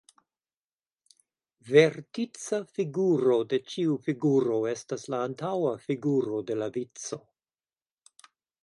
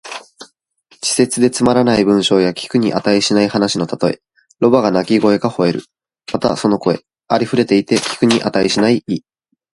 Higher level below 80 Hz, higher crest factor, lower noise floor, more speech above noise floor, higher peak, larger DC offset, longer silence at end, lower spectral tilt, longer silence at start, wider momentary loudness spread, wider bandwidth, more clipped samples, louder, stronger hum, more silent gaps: second, -78 dBFS vs -52 dBFS; first, 22 dB vs 16 dB; first, under -90 dBFS vs -54 dBFS; first, over 63 dB vs 40 dB; second, -6 dBFS vs 0 dBFS; neither; first, 1.45 s vs 0.55 s; first, -6 dB/octave vs -4.5 dB/octave; first, 1.65 s vs 0.05 s; first, 12 LU vs 9 LU; about the same, 11.5 kHz vs 11.5 kHz; neither; second, -28 LUFS vs -15 LUFS; neither; neither